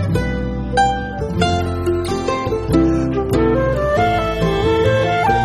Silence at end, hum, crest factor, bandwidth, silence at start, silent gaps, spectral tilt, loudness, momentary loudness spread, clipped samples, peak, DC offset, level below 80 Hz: 0 s; none; 16 dB; 15 kHz; 0 s; none; -6.5 dB/octave; -17 LUFS; 5 LU; under 0.1%; -2 dBFS; under 0.1%; -28 dBFS